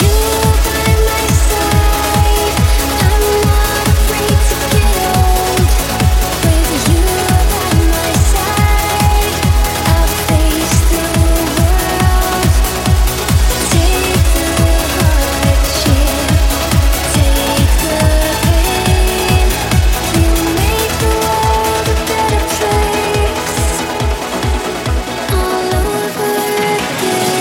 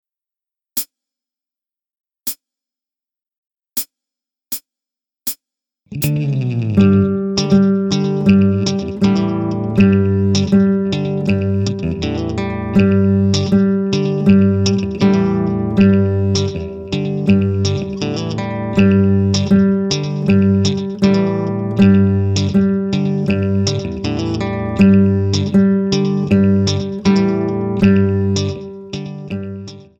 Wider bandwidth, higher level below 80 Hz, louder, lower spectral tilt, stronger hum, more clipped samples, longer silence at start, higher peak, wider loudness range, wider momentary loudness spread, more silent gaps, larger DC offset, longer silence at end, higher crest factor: second, 17 kHz vs 19 kHz; first, -16 dBFS vs -42 dBFS; about the same, -13 LUFS vs -15 LUFS; second, -4.5 dB/octave vs -7 dB/octave; neither; neither; second, 0 s vs 0.75 s; about the same, 0 dBFS vs 0 dBFS; second, 3 LU vs 14 LU; second, 3 LU vs 12 LU; second, none vs 3.38-3.43 s; neither; second, 0 s vs 0.2 s; about the same, 12 dB vs 14 dB